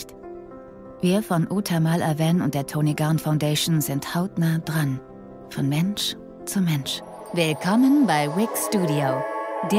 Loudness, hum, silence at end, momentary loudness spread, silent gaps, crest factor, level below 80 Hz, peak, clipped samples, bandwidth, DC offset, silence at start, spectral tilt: -23 LUFS; none; 0 s; 15 LU; none; 14 dB; -58 dBFS; -8 dBFS; under 0.1%; 16.5 kHz; under 0.1%; 0 s; -5.5 dB/octave